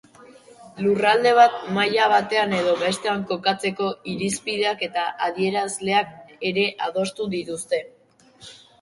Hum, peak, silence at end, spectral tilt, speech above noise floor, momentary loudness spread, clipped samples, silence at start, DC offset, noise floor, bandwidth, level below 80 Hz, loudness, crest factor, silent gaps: none; -2 dBFS; 0.25 s; -4 dB/octave; 32 dB; 10 LU; under 0.1%; 0.3 s; under 0.1%; -53 dBFS; 11.5 kHz; -66 dBFS; -22 LUFS; 20 dB; none